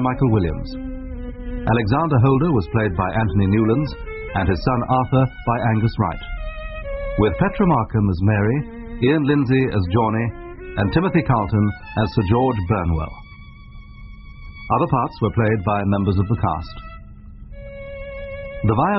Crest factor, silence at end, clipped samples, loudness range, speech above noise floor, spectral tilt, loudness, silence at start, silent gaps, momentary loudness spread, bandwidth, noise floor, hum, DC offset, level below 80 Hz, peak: 16 dB; 0 s; under 0.1%; 4 LU; 21 dB; -7 dB/octave; -20 LUFS; 0 s; none; 15 LU; 5.8 kHz; -40 dBFS; none; under 0.1%; -34 dBFS; -4 dBFS